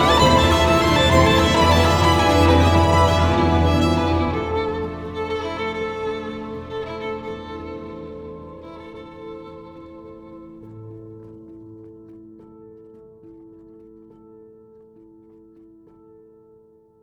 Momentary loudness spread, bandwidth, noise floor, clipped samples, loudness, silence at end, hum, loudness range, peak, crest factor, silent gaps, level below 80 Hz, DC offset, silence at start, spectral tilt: 25 LU; 17 kHz; -53 dBFS; under 0.1%; -18 LUFS; 3.7 s; none; 25 LU; -2 dBFS; 18 dB; none; -34 dBFS; under 0.1%; 0 s; -5.5 dB/octave